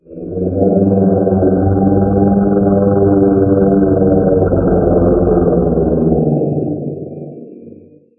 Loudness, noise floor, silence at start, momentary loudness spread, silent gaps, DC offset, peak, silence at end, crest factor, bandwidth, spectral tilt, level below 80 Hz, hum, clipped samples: -12 LUFS; -39 dBFS; 0.1 s; 10 LU; none; under 0.1%; 0 dBFS; 0.5 s; 12 dB; 1.7 kHz; -14.5 dB/octave; -30 dBFS; none; under 0.1%